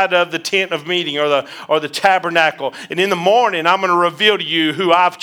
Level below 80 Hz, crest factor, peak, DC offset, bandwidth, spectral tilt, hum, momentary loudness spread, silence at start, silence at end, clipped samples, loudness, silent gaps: -70 dBFS; 16 dB; 0 dBFS; under 0.1%; over 20 kHz; -3.5 dB/octave; none; 6 LU; 0 s; 0 s; under 0.1%; -15 LUFS; none